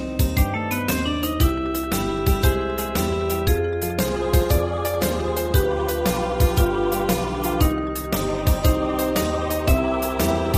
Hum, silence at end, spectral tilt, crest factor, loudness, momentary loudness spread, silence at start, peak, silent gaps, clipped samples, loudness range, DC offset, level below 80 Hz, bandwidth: none; 0 s; -5.5 dB/octave; 16 dB; -22 LUFS; 4 LU; 0 s; -6 dBFS; none; under 0.1%; 1 LU; under 0.1%; -26 dBFS; 15.5 kHz